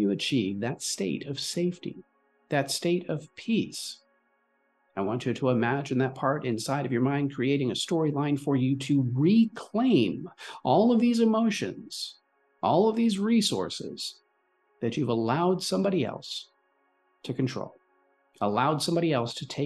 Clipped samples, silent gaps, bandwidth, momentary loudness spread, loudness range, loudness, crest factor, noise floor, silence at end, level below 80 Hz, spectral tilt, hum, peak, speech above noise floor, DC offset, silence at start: under 0.1%; none; 12.5 kHz; 13 LU; 6 LU; -27 LUFS; 16 dB; -71 dBFS; 0 s; -70 dBFS; -5.5 dB/octave; none; -10 dBFS; 44 dB; under 0.1%; 0 s